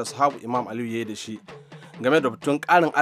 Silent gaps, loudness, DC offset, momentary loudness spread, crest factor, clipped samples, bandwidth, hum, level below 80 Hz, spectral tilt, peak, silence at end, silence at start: none; -23 LUFS; under 0.1%; 22 LU; 20 dB; under 0.1%; 15 kHz; none; -74 dBFS; -5 dB/octave; -4 dBFS; 0 s; 0 s